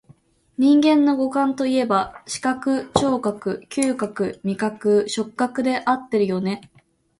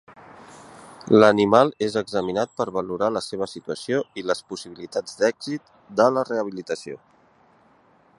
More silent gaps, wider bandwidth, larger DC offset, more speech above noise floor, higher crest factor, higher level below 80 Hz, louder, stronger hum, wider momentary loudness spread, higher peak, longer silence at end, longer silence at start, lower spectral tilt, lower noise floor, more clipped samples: neither; about the same, 11.5 kHz vs 11.5 kHz; neither; about the same, 34 dB vs 35 dB; second, 18 dB vs 24 dB; first, -56 dBFS vs -62 dBFS; about the same, -21 LUFS vs -23 LUFS; neither; second, 9 LU vs 16 LU; about the same, -2 dBFS vs 0 dBFS; second, 0.6 s vs 1.2 s; first, 0.6 s vs 0.1 s; about the same, -5 dB/octave vs -5.5 dB/octave; second, -54 dBFS vs -58 dBFS; neither